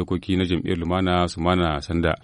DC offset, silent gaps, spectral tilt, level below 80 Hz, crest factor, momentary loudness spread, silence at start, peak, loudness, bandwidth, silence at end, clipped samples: under 0.1%; none; -6.5 dB/octave; -38 dBFS; 16 dB; 3 LU; 0 s; -6 dBFS; -23 LUFS; 10.5 kHz; 0.05 s; under 0.1%